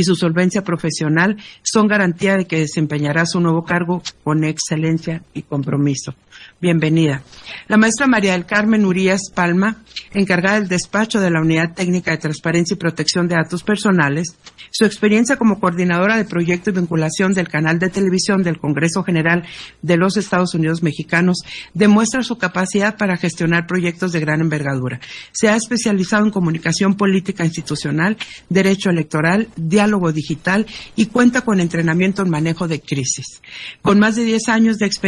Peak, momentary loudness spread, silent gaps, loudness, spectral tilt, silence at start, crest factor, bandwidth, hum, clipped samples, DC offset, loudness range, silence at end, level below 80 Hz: -2 dBFS; 8 LU; none; -17 LUFS; -5.5 dB/octave; 0 s; 16 dB; 11.5 kHz; none; under 0.1%; under 0.1%; 2 LU; 0 s; -52 dBFS